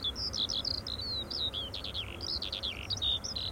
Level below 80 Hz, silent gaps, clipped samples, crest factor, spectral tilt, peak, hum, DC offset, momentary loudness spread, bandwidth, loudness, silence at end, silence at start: -48 dBFS; none; under 0.1%; 14 dB; -2.5 dB/octave; -22 dBFS; none; under 0.1%; 6 LU; 17 kHz; -33 LUFS; 0 s; 0 s